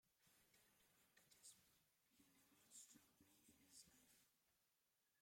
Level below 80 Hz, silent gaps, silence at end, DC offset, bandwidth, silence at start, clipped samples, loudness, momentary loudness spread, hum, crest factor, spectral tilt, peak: under -90 dBFS; none; 0 s; under 0.1%; 16.5 kHz; 0.05 s; under 0.1%; -67 LUFS; 3 LU; none; 24 dB; -1 dB/octave; -50 dBFS